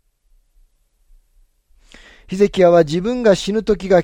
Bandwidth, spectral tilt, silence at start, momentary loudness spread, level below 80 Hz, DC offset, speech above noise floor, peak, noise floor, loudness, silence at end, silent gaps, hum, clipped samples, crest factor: 10.5 kHz; -6 dB/octave; 2.3 s; 7 LU; -42 dBFS; under 0.1%; 43 dB; -2 dBFS; -57 dBFS; -15 LUFS; 0 s; none; none; under 0.1%; 16 dB